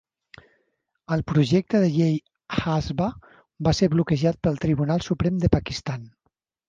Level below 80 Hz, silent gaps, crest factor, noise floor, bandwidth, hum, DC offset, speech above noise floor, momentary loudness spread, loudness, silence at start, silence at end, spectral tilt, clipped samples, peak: -42 dBFS; none; 20 dB; -74 dBFS; 7.6 kHz; none; under 0.1%; 52 dB; 9 LU; -23 LUFS; 1.1 s; 0.6 s; -7 dB/octave; under 0.1%; -4 dBFS